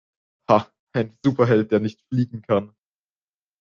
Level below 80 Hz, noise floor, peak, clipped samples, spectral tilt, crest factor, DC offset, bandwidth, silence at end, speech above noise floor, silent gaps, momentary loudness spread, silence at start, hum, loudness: -62 dBFS; under -90 dBFS; -2 dBFS; under 0.1%; -8.5 dB/octave; 20 dB; under 0.1%; 7.2 kHz; 0.95 s; over 69 dB; 0.79-0.87 s; 9 LU; 0.5 s; 50 Hz at -50 dBFS; -22 LUFS